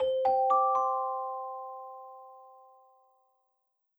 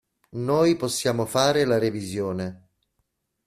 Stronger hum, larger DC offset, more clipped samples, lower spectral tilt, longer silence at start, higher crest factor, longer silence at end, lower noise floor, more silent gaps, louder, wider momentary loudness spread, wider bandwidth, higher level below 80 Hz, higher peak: neither; neither; neither; about the same, -4.5 dB/octave vs -5 dB/octave; second, 0 s vs 0.35 s; about the same, 16 dB vs 20 dB; first, 1.5 s vs 0.9 s; about the same, -75 dBFS vs -75 dBFS; neither; second, -29 LUFS vs -23 LUFS; first, 22 LU vs 11 LU; first, over 20 kHz vs 15 kHz; second, -76 dBFS vs -60 dBFS; second, -16 dBFS vs -4 dBFS